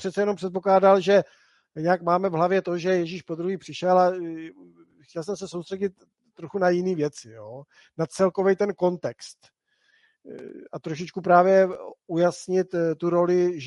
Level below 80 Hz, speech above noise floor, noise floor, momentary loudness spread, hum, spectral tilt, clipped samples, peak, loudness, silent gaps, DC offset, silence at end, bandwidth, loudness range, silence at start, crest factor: -72 dBFS; 42 dB; -66 dBFS; 22 LU; none; -6.5 dB/octave; under 0.1%; -4 dBFS; -23 LUFS; none; under 0.1%; 0 s; 11.5 kHz; 7 LU; 0 s; 20 dB